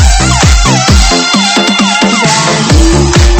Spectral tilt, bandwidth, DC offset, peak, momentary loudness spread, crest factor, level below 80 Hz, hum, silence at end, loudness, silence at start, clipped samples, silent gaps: -3.5 dB/octave; 14.5 kHz; under 0.1%; 0 dBFS; 1 LU; 6 dB; -10 dBFS; none; 0 s; -7 LUFS; 0 s; 2%; none